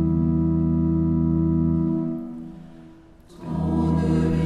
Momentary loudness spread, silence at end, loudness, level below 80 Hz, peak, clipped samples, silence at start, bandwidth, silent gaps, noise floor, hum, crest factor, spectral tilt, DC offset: 16 LU; 0 s; -22 LUFS; -36 dBFS; -10 dBFS; under 0.1%; 0 s; 5 kHz; none; -47 dBFS; none; 12 dB; -10 dB/octave; under 0.1%